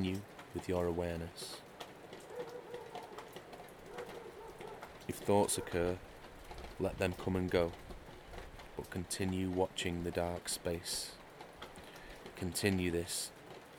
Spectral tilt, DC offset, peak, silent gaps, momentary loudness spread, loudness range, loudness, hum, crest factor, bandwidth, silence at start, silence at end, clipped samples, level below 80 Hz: -4.5 dB/octave; under 0.1%; -16 dBFS; none; 17 LU; 11 LU; -38 LUFS; none; 22 dB; 20 kHz; 0 s; 0 s; under 0.1%; -58 dBFS